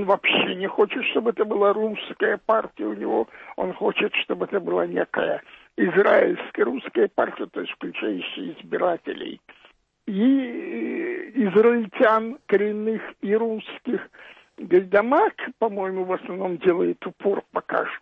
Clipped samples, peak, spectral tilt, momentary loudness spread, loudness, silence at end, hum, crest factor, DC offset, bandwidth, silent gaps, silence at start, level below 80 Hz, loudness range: under 0.1%; -6 dBFS; -8 dB/octave; 12 LU; -23 LUFS; 0.05 s; none; 16 dB; under 0.1%; 4.7 kHz; none; 0 s; -68 dBFS; 4 LU